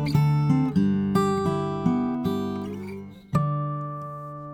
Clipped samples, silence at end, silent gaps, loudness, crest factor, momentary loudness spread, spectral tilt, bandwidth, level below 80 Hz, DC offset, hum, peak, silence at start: under 0.1%; 0 s; none; -25 LUFS; 16 dB; 14 LU; -8.5 dB/octave; 15.5 kHz; -50 dBFS; under 0.1%; none; -8 dBFS; 0 s